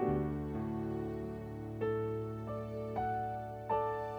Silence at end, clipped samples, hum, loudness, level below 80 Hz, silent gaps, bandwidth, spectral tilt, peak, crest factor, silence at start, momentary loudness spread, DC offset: 0 s; under 0.1%; 60 Hz at -65 dBFS; -38 LUFS; -54 dBFS; none; over 20 kHz; -9 dB/octave; -22 dBFS; 16 dB; 0 s; 7 LU; under 0.1%